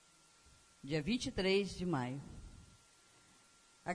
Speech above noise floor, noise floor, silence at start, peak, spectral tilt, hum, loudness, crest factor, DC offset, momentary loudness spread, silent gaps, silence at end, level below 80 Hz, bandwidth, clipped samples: 30 dB; -67 dBFS; 0.85 s; -22 dBFS; -5 dB/octave; none; -38 LUFS; 20 dB; under 0.1%; 22 LU; none; 0 s; -60 dBFS; 11 kHz; under 0.1%